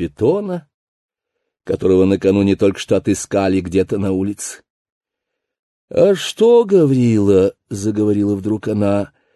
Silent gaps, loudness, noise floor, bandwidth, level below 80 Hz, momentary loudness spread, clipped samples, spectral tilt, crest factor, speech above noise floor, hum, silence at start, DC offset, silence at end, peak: 0.74-1.09 s, 4.70-4.85 s, 4.92-5.01 s, 5.59-5.88 s; -16 LUFS; -79 dBFS; 12.5 kHz; -42 dBFS; 11 LU; under 0.1%; -6.5 dB/octave; 14 dB; 64 dB; none; 0 s; under 0.1%; 0.3 s; -2 dBFS